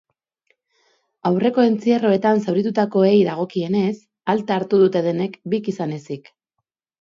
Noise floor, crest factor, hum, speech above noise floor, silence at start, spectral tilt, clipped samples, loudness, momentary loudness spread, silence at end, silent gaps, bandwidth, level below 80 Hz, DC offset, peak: -80 dBFS; 16 dB; none; 61 dB; 1.25 s; -8 dB/octave; under 0.1%; -19 LUFS; 11 LU; 0.8 s; none; 7.4 kHz; -66 dBFS; under 0.1%; -4 dBFS